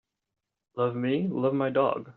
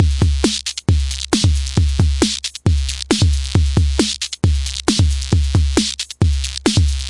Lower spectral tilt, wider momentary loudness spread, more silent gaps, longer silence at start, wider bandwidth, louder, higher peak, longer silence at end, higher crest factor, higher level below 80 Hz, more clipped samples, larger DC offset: first, -6.5 dB/octave vs -4.5 dB/octave; about the same, 5 LU vs 3 LU; neither; first, 0.75 s vs 0 s; second, 4.4 kHz vs 11.5 kHz; second, -27 LUFS vs -17 LUFS; second, -12 dBFS vs 0 dBFS; about the same, 0.05 s vs 0 s; about the same, 16 dB vs 16 dB; second, -72 dBFS vs -22 dBFS; neither; neither